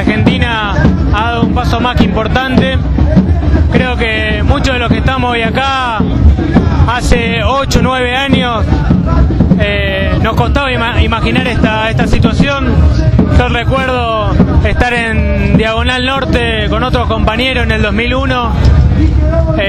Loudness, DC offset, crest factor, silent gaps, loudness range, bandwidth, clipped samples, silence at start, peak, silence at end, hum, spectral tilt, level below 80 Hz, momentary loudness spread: -11 LUFS; under 0.1%; 10 dB; none; 1 LU; 10.5 kHz; 0.4%; 0 s; 0 dBFS; 0 s; none; -6.5 dB/octave; -16 dBFS; 2 LU